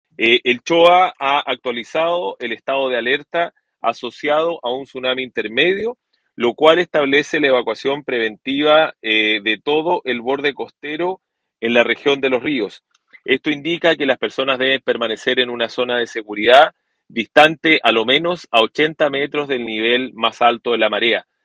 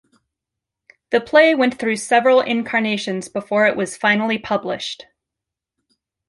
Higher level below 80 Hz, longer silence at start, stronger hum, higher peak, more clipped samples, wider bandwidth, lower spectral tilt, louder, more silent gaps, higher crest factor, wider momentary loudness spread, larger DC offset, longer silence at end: about the same, -64 dBFS vs -62 dBFS; second, 0.2 s vs 1.1 s; neither; about the same, 0 dBFS vs -2 dBFS; neither; second, 10 kHz vs 11.5 kHz; about the same, -4 dB/octave vs -4 dB/octave; about the same, -17 LUFS vs -18 LUFS; neither; about the same, 18 dB vs 18 dB; about the same, 11 LU vs 12 LU; neither; second, 0.25 s vs 1.35 s